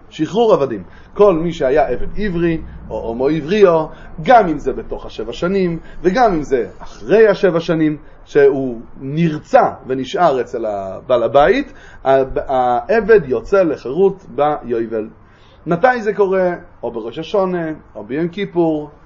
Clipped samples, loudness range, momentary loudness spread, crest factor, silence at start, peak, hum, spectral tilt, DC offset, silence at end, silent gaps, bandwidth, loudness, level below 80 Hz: under 0.1%; 3 LU; 14 LU; 16 dB; 0.15 s; 0 dBFS; none; -7 dB/octave; under 0.1%; 0.15 s; none; 7.4 kHz; -16 LUFS; -36 dBFS